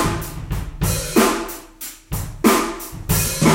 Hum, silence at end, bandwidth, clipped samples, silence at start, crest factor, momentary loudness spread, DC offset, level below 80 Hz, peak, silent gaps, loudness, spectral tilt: none; 0 s; 17 kHz; under 0.1%; 0 s; 20 dB; 14 LU; under 0.1%; -32 dBFS; 0 dBFS; none; -20 LUFS; -4.5 dB/octave